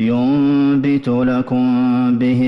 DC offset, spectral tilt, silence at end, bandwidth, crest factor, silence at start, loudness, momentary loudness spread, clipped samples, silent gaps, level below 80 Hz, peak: under 0.1%; -9 dB/octave; 0 s; 5.8 kHz; 6 dB; 0 s; -15 LUFS; 3 LU; under 0.1%; none; -50 dBFS; -8 dBFS